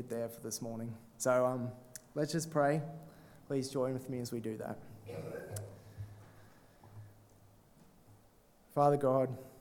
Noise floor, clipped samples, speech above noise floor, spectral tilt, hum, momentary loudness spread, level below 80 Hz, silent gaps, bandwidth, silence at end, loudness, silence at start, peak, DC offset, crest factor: -65 dBFS; under 0.1%; 30 dB; -6 dB/octave; none; 20 LU; -70 dBFS; none; 19 kHz; 0 s; -36 LUFS; 0 s; -16 dBFS; under 0.1%; 22 dB